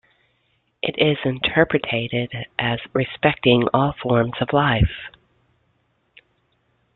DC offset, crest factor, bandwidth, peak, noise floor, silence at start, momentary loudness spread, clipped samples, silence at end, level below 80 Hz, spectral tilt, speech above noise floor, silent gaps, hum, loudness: under 0.1%; 20 dB; 4.3 kHz; -2 dBFS; -67 dBFS; 0.85 s; 9 LU; under 0.1%; 1.85 s; -40 dBFS; -10.5 dB/octave; 47 dB; none; none; -20 LUFS